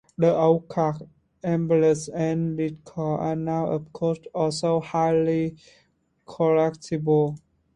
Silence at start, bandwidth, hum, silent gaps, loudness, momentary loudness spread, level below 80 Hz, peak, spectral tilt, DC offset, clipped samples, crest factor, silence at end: 0.2 s; 11 kHz; none; none; -24 LUFS; 9 LU; -60 dBFS; -6 dBFS; -7 dB/octave; under 0.1%; under 0.1%; 18 dB; 0.4 s